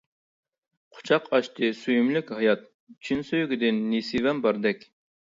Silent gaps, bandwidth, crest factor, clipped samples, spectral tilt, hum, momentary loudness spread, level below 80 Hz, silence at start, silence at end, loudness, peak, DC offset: 2.74-2.87 s; 7.6 kHz; 18 dB; under 0.1%; -6 dB/octave; none; 7 LU; -66 dBFS; 0.95 s; 0.55 s; -25 LUFS; -8 dBFS; under 0.1%